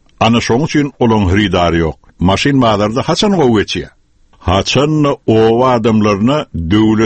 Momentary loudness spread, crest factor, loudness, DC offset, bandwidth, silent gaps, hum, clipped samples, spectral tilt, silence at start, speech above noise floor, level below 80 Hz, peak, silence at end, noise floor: 6 LU; 12 dB; -12 LUFS; under 0.1%; 8.8 kHz; none; none; under 0.1%; -6 dB/octave; 0.2 s; 35 dB; -34 dBFS; 0 dBFS; 0 s; -46 dBFS